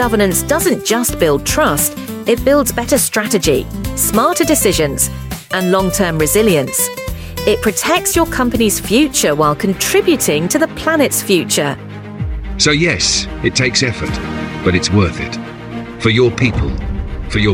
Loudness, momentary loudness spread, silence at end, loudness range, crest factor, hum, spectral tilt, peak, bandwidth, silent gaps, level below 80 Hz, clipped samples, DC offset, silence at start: -14 LUFS; 11 LU; 0 s; 2 LU; 14 dB; none; -4 dB/octave; 0 dBFS; 17 kHz; none; -30 dBFS; under 0.1%; under 0.1%; 0 s